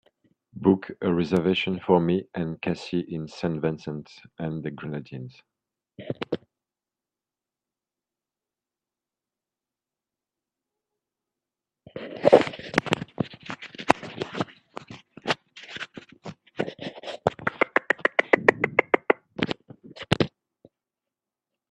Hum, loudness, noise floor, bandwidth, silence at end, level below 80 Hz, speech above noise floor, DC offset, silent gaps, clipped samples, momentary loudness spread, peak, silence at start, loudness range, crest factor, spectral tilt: none; -26 LUFS; -90 dBFS; 11.5 kHz; 1.45 s; -62 dBFS; 63 dB; under 0.1%; none; under 0.1%; 20 LU; 0 dBFS; 0.55 s; 15 LU; 28 dB; -6 dB/octave